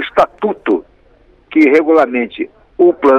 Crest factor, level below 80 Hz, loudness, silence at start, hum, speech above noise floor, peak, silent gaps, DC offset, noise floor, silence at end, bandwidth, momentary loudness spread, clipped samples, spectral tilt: 12 dB; -50 dBFS; -13 LUFS; 0 s; none; 37 dB; -2 dBFS; none; under 0.1%; -48 dBFS; 0 s; 7.4 kHz; 11 LU; under 0.1%; -6.5 dB/octave